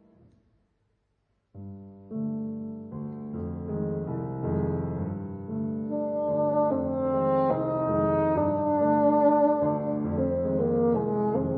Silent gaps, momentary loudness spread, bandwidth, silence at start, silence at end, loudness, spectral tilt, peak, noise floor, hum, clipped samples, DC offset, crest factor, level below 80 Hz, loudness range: none; 14 LU; 4.4 kHz; 1.55 s; 0 s; -27 LUFS; -13 dB/octave; -12 dBFS; -74 dBFS; none; under 0.1%; under 0.1%; 14 dB; -54 dBFS; 12 LU